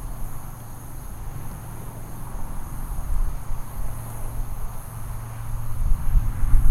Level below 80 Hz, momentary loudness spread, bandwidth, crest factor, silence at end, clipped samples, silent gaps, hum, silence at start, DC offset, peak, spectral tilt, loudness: -24 dBFS; 12 LU; 14.5 kHz; 20 dB; 0 s; under 0.1%; none; none; 0 s; under 0.1%; -2 dBFS; -6 dB/octave; -32 LUFS